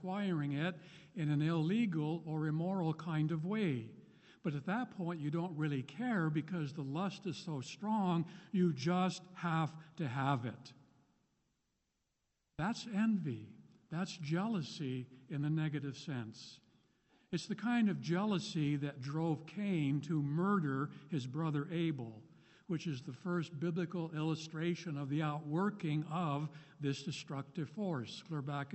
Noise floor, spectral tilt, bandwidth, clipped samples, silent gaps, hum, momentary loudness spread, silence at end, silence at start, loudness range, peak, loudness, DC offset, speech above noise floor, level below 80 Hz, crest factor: -85 dBFS; -7 dB/octave; 8.2 kHz; under 0.1%; none; none; 9 LU; 0 s; 0 s; 4 LU; -20 dBFS; -38 LUFS; under 0.1%; 47 dB; -76 dBFS; 18 dB